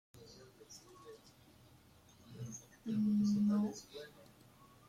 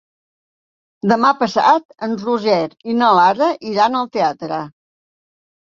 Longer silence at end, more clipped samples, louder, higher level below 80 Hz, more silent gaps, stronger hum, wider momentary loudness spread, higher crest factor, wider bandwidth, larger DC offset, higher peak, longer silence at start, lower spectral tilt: second, 0.8 s vs 1.05 s; neither; second, -37 LUFS vs -16 LUFS; second, -74 dBFS vs -64 dBFS; second, none vs 1.85-1.89 s; neither; first, 25 LU vs 12 LU; about the same, 14 dB vs 16 dB; first, 13 kHz vs 7.4 kHz; neither; second, -26 dBFS vs -2 dBFS; second, 0.15 s vs 1.05 s; about the same, -6.5 dB/octave vs -5.5 dB/octave